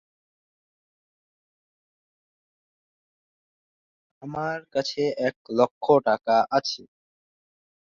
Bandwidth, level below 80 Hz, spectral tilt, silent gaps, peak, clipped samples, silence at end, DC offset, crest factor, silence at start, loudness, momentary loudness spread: 7.4 kHz; -70 dBFS; -5 dB/octave; 5.36-5.45 s, 5.71-5.81 s; -6 dBFS; under 0.1%; 1 s; under 0.1%; 24 dB; 4.2 s; -24 LUFS; 12 LU